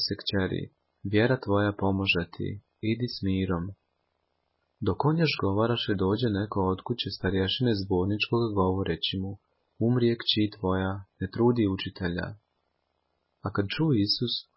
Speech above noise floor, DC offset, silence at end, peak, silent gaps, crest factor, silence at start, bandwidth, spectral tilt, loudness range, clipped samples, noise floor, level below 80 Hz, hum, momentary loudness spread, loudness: 49 dB; under 0.1%; 0.15 s; -10 dBFS; none; 18 dB; 0 s; 5.8 kHz; -10 dB/octave; 3 LU; under 0.1%; -77 dBFS; -48 dBFS; none; 10 LU; -28 LUFS